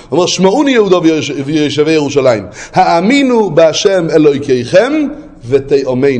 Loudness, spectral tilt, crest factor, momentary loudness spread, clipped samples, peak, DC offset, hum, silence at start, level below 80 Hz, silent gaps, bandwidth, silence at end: -10 LUFS; -5 dB/octave; 10 dB; 6 LU; 0.2%; 0 dBFS; under 0.1%; none; 0.1 s; -44 dBFS; none; 9.6 kHz; 0 s